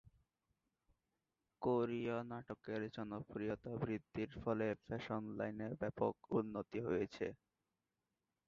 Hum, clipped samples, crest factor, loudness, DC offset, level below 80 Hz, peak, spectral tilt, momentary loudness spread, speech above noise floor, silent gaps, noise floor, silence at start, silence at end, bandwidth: none; under 0.1%; 20 dB; -43 LUFS; under 0.1%; -70 dBFS; -22 dBFS; -6.5 dB/octave; 8 LU; over 48 dB; none; under -90 dBFS; 1.6 s; 1.15 s; 7.2 kHz